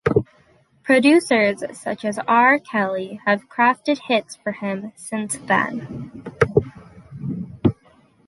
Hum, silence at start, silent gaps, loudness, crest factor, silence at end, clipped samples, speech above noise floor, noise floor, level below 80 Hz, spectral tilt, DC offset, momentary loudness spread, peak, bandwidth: none; 0.05 s; none; -20 LUFS; 20 dB; 0.55 s; under 0.1%; 37 dB; -56 dBFS; -48 dBFS; -5.5 dB/octave; under 0.1%; 16 LU; -2 dBFS; 11.5 kHz